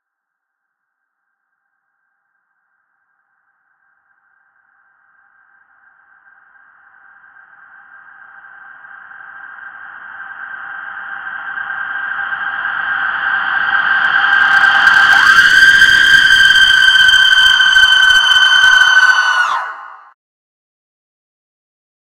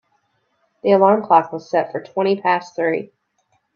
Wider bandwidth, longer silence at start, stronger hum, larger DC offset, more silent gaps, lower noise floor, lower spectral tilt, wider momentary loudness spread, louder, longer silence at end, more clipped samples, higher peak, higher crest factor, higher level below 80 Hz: first, 16.5 kHz vs 7 kHz; first, 9.15 s vs 0.85 s; neither; neither; neither; first, -77 dBFS vs -66 dBFS; second, 1.5 dB/octave vs -7 dB/octave; first, 22 LU vs 11 LU; first, -8 LUFS vs -18 LUFS; first, 2.2 s vs 0.7 s; neither; about the same, 0 dBFS vs 0 dBFS; about the same, 14 dB vs 18 dB; first, -48 dBFS vs -70 dBFS